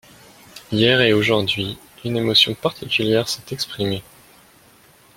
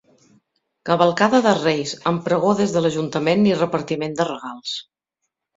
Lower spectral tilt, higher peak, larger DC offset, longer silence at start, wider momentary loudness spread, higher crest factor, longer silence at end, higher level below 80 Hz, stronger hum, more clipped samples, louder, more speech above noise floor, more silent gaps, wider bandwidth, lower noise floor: about the same, -4.5 dB/octave vs -5.5 dB/octave; about the same, -2 dBFS vs -2 dBFS; neither; second, 0.55 s vs 0.85 s; about the same, 12 LU vs 12 LU; about the same, 20 dB vs 20 dB; first, 1.15 s vs 0.75 s; first, -54 dBFS vs -60 dBFS; neither; neither; about the same, -19 LUFS vs -20 LUFS; second, 32 dB vs 60 dB; neither; first, 16.5 kHz vs 7.8 kHz; second, -51 dBFS vs -79 dBFS